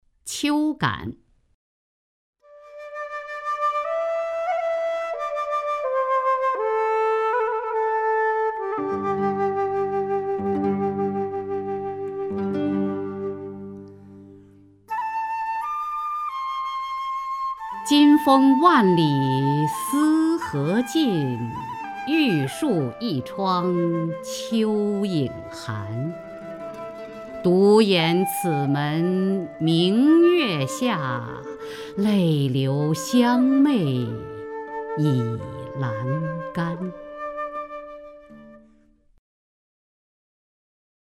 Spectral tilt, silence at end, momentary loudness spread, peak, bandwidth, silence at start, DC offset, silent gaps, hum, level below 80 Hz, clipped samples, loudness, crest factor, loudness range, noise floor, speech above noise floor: -6 dB/octave; 2.5 s; 16 LU; -4 dBFS; 16 kHz; 0.25 s; under 0.1%; 1.54-2.33 s; none; -60 dBFS; under 0.1%; -23 LUFS; 20 dB; 11 LU; -57 dBFS; 37 dB